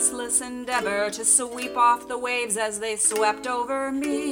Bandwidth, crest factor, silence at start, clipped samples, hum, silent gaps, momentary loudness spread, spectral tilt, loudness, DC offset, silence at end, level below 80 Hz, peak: 19 kHz; 20 dB; 0 s; under 0.1%; none; none; 8 LU; -1 dB/octave; -23 LUFS; under 0.1%; 0 s; -60 dBFS; -6 dBFS